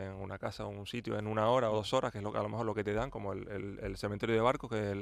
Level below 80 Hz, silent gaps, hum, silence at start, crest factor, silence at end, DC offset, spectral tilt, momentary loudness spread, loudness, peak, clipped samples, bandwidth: -56 dBFS; none; none; 0 s; 20 dB; 0 s; under 0.1%; -6 dB/octave; 11 LU; -35 LUFS; -16 dBFS; under 0.1%; 14 kHz